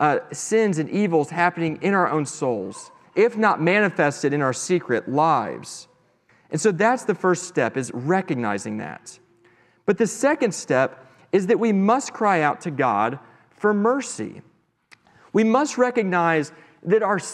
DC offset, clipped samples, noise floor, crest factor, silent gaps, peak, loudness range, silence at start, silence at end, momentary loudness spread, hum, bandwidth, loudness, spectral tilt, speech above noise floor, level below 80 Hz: under 0.1%; under 0.1%; -60 dBFS; 18 dB; none; -4 dBFS; 3 LU; 0 s; 0 s; 12 LU; none; 12.5 kHz; -22 LUFS; -5.5 dB/octave; 39 dB; -74 dBFS